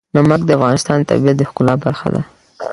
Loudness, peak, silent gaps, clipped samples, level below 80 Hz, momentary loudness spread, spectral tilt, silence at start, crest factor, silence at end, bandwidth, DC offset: -14 LUFS; 0 dBFS; none; under 0.1%; -46 dBFS; 10 LU; -6.5 dB/octave; 0.15 s; 14 dB; 0 s; 11.5 kHz; under 0.1%